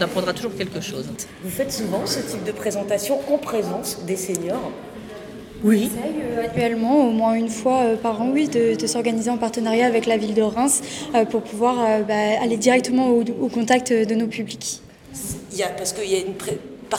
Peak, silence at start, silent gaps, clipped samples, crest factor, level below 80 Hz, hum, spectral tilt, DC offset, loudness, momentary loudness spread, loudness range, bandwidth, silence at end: -2 dBFS; 0 s; none; under 0.1%; 18 dB; -54 dBFS; none; -4 dB/octave; under 0.1%; -21 LUFS; 11 LU; 5 LU; 17.5 kHz; 0 s